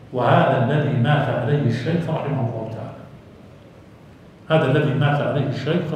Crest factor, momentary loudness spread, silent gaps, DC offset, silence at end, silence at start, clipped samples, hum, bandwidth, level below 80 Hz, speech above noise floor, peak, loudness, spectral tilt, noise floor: 18 dB; 12 LU; none; under 0.1%; 0 s; 0 s; under 0.1%; none; 8.6 kHz; -56 dBFS; 26 dB; -2 dBFS; -20 LUFS; -8.5 dB/octave; -45 dBFS